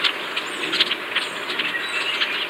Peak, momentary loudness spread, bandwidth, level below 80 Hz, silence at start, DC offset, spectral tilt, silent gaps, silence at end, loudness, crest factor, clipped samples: -4 dBFS; 5 LU; 16 kHz; -72 dBFS; 0 s; under 0.1%; -1 dB/octave; none; 0 s; -22 LUFS; 22 dB; under 0.1%